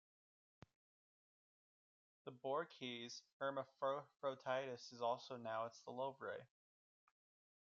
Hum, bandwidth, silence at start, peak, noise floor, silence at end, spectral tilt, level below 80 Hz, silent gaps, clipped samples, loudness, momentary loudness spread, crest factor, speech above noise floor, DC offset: none; 7.4 kHz; 2.25 s; -30 dBFS; under -90 dBFS; 1.25 s; -2.5 dB/octave; under -90 dBFS; 3.32-3.40 s; under 0.1%; -47 LUFS; 7 LU; 20 dB; over 43 dB; under 0.1%